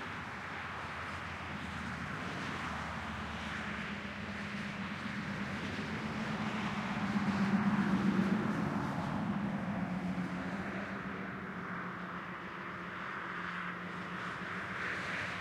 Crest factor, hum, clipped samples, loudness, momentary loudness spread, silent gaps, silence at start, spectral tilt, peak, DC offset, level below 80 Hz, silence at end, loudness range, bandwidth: 18 dB; none; under 0.1%; -38 LUFS; 9 LU; none; 0 s; -6 dB/octave; -20 dBFS; under 0.1%; -62 dBFS; 0 s; 7 LU; 12 kHz